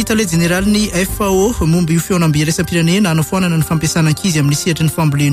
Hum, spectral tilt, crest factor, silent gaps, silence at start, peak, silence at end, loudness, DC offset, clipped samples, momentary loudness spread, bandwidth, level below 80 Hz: none; -5 dB/octave; 10 dB; none; 0 s; -4 dBFS; 0 s; -14 LUFS; under 0.1%; under 0.1%; 2 LU; 16 kHz; -32 dBFS